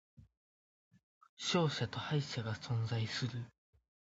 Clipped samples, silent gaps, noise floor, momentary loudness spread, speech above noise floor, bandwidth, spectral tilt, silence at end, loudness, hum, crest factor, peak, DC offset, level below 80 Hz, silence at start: under 0.1%; 0.37-0.91 s, 1.03-1.21 s, 1.29-1.37 s; under -90 dBFS; 8 LU; over 53 dB; 7.6 kHz; -4.5 dB/octave; 0.65 s; -38 LUFS; none; 20 dB; -20 dBFS; under 0.1%; -68 dBFS; 0.2 s